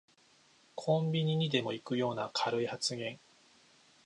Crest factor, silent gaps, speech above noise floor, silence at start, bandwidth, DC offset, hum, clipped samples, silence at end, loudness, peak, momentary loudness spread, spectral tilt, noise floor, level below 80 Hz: 20 dB; none; 33 dB; 0.75 s; 11 kHz; under 0.1%; none; under 0.1%; 0.9 s; -33 LUFS; -14 dBFS; 11 LU; -5 dB/octave; -66 dBFS; -78 dBFS